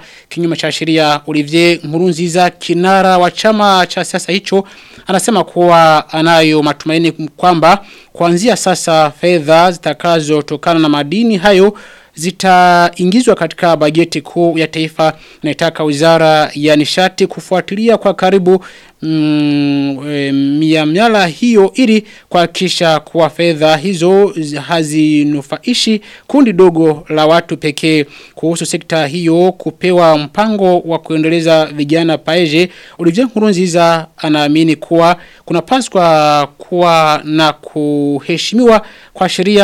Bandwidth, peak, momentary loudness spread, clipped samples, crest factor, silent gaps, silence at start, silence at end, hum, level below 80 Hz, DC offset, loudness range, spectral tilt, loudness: 16 kHz; 0 dBFS; 7 LU; under 0.1%; 10 dB; none; 0.3 s; 0 s; none; -50 dBFS; under 0.1%; 2 LU; -5 dB/octave; -11 LUFS